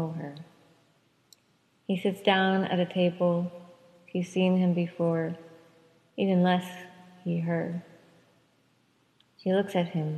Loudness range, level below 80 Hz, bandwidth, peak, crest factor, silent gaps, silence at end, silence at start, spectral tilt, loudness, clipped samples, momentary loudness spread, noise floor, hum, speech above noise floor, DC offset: 5 LU; -78 dBFS; 12.5 kHz; -8 dBFS; 22 dB; none; 0 s; 0 s; -7.5 dB/octave; -28 LUFS; under 0.1%; 18 LU; -68 dBFS; none; 41 dB; under 0.1%